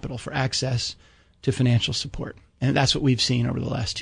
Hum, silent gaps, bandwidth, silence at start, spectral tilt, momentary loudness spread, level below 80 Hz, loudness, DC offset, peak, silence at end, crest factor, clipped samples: none; none; 10.5 kHz; 0.05 s; -5 dB/octave; 10 LU; -46 dBFS; -24 LUFS; under 0.1%; -8 dBFS; 0 s; 18 dB; under 0.1%